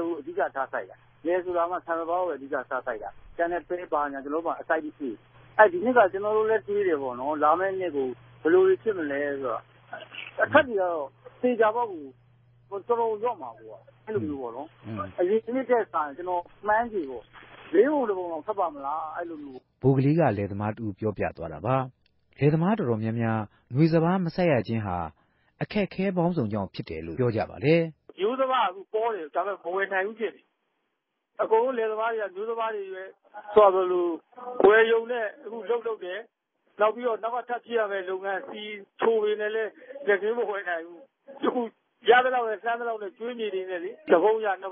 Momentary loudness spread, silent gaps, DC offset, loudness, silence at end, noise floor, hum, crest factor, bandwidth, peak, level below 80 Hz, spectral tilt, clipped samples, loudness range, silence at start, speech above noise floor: 15 LU; none; under 0.1%; -26 LUFS; 0 s; -79 dBFS; none; 22 dB; 5.8 kHz; -4 dBFS; -60 dBFS; -11 dB/octave; under 0.1%; 6 LU; 0 s; 53 dB